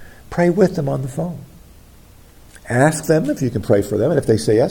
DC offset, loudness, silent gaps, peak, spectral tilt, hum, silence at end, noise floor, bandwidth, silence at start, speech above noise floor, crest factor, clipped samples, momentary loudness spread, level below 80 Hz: under 0.1%; -18 LUFS; none; 0 dBFS; -6.5 dB/octave; none; 0 s; -45 dBFS; 17.5 kHz; 0 s; 28 dB; 18 dB; under 0.1%; 11 LU; -46 dBFS